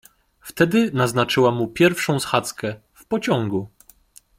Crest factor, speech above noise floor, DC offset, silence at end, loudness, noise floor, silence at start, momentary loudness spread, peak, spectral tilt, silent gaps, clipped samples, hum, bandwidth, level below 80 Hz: 20 dB; 32 dB; under 0.1%; 0.7 s; -20 LUFS; -52 dBFS; 0.45 s; 16 LU; -2 dBFS; -5 dB/octave; none; under 0.1%; none; 16.5 kHz; -56 dBFS